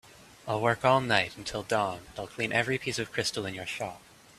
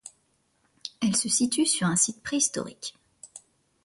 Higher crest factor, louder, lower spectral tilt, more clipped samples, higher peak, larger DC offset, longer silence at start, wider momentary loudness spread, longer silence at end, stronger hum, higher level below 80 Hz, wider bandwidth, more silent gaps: about the same, 24 dB vs 22 dB; second, -29 LUFS vs -25 LUFS; first, -4 dB/octave vs -2.5 dB/octave; neither; about the same, -6 dBFS vs -6 dBFS; neither; about the same, 0.05 s vs 0.05 s; second, 13 LU vs 20 LU; about the same, 0.4 s vs 0.45 s; neither; first, -60 dBFS vs -66 dBFS; first, 14.5 kHz vs 11.5 kHz; neither